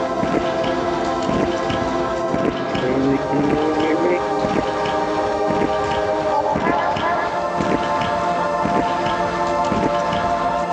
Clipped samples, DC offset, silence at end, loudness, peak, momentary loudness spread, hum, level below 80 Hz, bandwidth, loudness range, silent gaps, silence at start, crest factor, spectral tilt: under 0.1%; under 0.1%; 0 s; -20 LUFS; -4 dBFS; 2 LU; none; -42 dBFS; 10 kHz; 1 LU; none; 0 s; 16 dB; -6 dB/octave